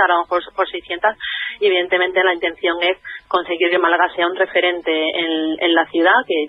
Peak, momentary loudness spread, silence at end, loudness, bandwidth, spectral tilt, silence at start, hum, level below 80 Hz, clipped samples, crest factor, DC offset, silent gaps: -2 dBFS; 7 LU; 0 s; -17 LUFS; 5.4 kHz; -5.5 dB/octave; 0 s; none; -60 dBFS; under 0.1%; 16 dB; under 0.1%; none